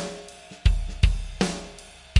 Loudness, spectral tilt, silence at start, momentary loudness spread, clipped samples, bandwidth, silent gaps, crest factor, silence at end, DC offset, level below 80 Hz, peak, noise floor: -27 LUFS; -5 dB/octave; 0 s; 17 LU; under 0.1%; 11.5 kHz; none; 20 dB; 0 s; under 0.1%; -28 dBFS; -4 dBFS; -45 dBFS